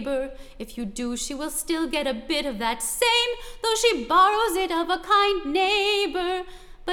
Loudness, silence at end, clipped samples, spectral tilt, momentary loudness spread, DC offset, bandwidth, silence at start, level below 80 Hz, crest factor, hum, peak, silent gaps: -23 LUFS; 0 s; under 0.1%; -1.5 dB/octave; 13 LU; under 0.1%; 18.5 kHz; 0 s; -46 dBFS; 18 dB; none; -8 dBFS; none